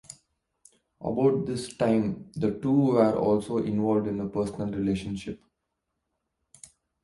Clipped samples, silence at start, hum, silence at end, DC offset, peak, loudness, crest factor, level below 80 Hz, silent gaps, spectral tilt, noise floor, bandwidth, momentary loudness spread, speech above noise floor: under 0.1%; 1 s; none; 1.7 s; under 0.1%; -10 dBFS; -27 LUFS; 18 dB; -56 dBFS; none; -7.5 dB/octave; -81 dBFS; 11.5 kHz; 13 LU; 55 dB